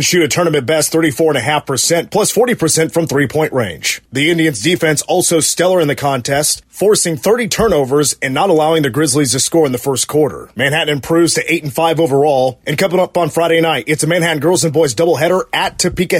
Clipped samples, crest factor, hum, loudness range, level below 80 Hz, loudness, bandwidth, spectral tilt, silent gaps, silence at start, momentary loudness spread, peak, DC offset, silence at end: under 0.1%; 12 dB; none; 1 LU; -44 dBFS; -13 LUFS; 16.5 kHz; -3.5 dB/octave; none; 0 s; 4 LU; -2 dBFS; under 0.1%; 0 s